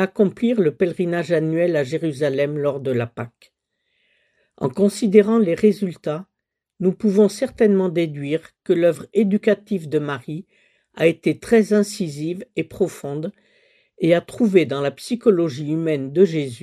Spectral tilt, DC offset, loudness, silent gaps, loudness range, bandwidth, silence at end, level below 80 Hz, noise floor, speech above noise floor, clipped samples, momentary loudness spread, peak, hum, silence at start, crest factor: -7 dB/octave; under 0.1%; -20 LUFS; none; 3 LU; 14 kHz; 0.05 s; -62 dBFS; -71 dBFS; 52 dB; under 0.1%; 11 LU; 0 dBFS; none; 0 s; 20 dB